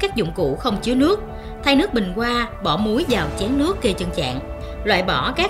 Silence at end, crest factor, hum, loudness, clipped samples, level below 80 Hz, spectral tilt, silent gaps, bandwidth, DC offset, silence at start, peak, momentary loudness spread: 0 s; 18 dB; none; -20 LUFS; under 0.1%; -34 dBFS; -5 dB/octave; none; 15.5 kHz; under 0.1%; 0 s; -2 dBFS; 7 LU